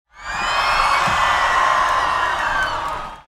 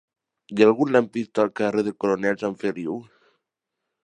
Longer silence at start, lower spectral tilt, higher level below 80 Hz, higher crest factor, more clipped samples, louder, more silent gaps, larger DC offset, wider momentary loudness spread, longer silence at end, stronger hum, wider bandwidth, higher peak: second, 0.15 s vs 0.5 s; second, -2 dB/octave vs -6.5 dB/octave; first, -38 dBFS vs -68 dBFS; second, 14 dB vs 20 dB; neither; first, -17 LUFS vs -23 LUFS; neither; neither; second, 8 LU vs 13 LU; second, 0.05 s vs 1.05 s; neither; first, 16.5 kHz vs 9.6 kHz; about the same, -4 dBFS vs -4 dBFS